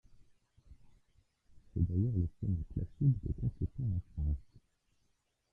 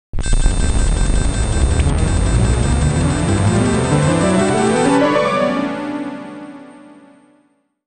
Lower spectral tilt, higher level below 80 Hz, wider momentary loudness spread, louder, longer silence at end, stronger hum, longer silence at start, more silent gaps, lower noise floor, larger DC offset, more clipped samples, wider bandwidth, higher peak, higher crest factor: first, -12.5 dB/octave vs -5.5 dB/octave; second, -46 dBFS vs -20 dBFS; second, 7 LU vs 11 LU; second, -36 LUFS vs -16 LUFS; about the same, 1.1 s vs 1.15 s; neither; first, 0.7 s vs 0.15 s; neither; first, -78 dBFS vs -59 dBFS; neither; neither; second, 0.9 kHz vs 9.4 kHz; second, -18 dBFS vs -2 dBFS; first, 18 dB vs 12 dB